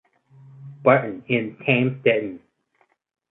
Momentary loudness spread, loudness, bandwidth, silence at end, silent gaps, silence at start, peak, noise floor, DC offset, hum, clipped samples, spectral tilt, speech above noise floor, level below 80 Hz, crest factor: 8 LU; -21 LUFS; 4 kHz; 0.9 s; none; 0.6 s; 0 dBFS; -66 dBFS; under 0.1%; none; under 0.1%; -10.5 dB/octave; 45 dB; -66 dBFS; 22 dB